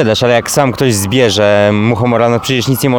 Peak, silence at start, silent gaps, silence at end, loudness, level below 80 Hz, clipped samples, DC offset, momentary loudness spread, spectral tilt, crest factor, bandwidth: 0 dBFS; 0 s; none; 0 s; -11 LUFS; -44 dBFS; under 0.1%; 0.5%; 3 LU; -5 dB/octave; 10 dB; over 20 kHz